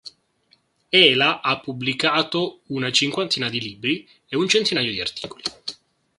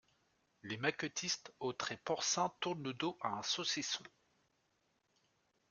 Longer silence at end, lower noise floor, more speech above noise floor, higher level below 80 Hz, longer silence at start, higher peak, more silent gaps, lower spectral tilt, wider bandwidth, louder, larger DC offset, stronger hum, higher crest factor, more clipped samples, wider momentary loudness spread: second, 0.45 s vs 1.6 s; second, -63 dBFS vs -80 dBFS; about the same, 41 dB vs 40 dB; first, -62 dBFS vs -82 dBFS; second, 0.05 s vs 0.65 s; first, 0 dBFS vs -18 dBFS; neither; about the same, -3 dB/octave vs -2.5 dB/octave; about the same, 11.5 kHz vs 11 kHz; first, -20 LUFS vs -39 LUFS; neither; neither; about the same, 22 dB vs 24 dB; neither; first, 15 LU vs 7 LU